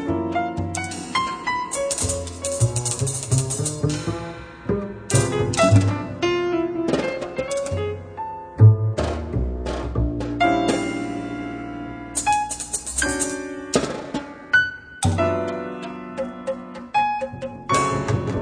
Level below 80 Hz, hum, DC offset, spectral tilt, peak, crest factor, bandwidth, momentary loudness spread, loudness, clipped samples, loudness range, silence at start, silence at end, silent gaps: -38 dBFS; none; under 0.1%; -5 dB/octave; -2 dBFS; 20 dB; 10.5 kHz; 12 LU; -23 LUFS; under 0.1%; 3 LU; 0 s; 0 s; none